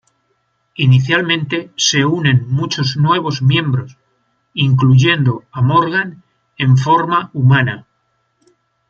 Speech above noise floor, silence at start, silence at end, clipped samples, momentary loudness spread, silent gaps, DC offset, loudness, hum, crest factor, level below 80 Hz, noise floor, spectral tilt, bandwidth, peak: 51 dB; 0.8 s; 1.1 s; under 0.1%; 9 LU; none; under 0.1%; -14 LUFS; none; 14 dB; -54 dBFS; -64 dBFS; -5 dB/octave; 7.6 kHz; 0 dBFS